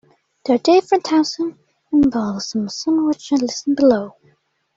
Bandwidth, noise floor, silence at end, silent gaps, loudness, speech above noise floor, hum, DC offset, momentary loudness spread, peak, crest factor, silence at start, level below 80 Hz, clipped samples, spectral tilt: 7.8 kHz; -60 dBFS; 0.65 s; none; -18 LUFS; 43 dB; none; under 0.1%; 10 LU; -2 dBFS; 16 dB; 0.45 s; -54 dBFS; under 0.1%; -5 dB/octave